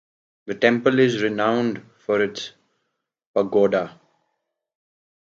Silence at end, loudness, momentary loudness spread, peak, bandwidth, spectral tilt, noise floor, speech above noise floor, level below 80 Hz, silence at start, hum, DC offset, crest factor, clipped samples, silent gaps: 1.4 s; -21 LUFS; 16 LU; -2 dBFS; 7.6 kHz; -6 dB/octave; -77 dBFS; 57 dB; -68 dBFS; 0.45 s; none; under 0.1%; 20 dB; under 0.1%; 3.26-3.34 s